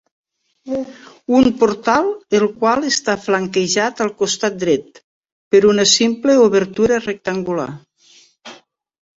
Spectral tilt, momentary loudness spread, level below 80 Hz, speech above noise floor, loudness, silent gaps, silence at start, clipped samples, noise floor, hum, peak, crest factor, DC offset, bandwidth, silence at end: -3.5 dB/octave; 12 LU; -54 dBFS; 35 dB; -16 LUFS; 5.04-5.23 s, 5.32-5.51 s; 0.65 s; under 0.1%; -51 dBFS; none; 0 dBFS; 16 dB; under 0.1%; 8 kHz; 0.65 s